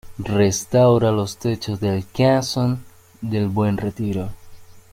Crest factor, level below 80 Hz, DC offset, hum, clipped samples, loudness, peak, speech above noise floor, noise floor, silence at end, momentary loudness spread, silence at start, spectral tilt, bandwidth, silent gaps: 16 dB; -46 dBFS; under 0.1%; none; under 0.1%; -20 LUFS; -6 dBFS; 21 dB; -41 dBFS; 0.15 s; 11 LU; 0.05 s; -6 dB/octave; 16 kHz; none